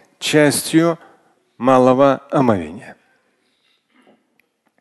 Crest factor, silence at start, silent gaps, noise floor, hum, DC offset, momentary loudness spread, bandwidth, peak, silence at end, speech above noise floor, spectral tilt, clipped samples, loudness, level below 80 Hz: 18 dB; 0.2 s; none; -64 dBFS; none; under 0.1%; 14 LU; 12.5 kHz; 0 dBFS; 1.9 s; 49 dB; -5 dB/octave; under 0.1%; -15 LUFS; -54 dBFS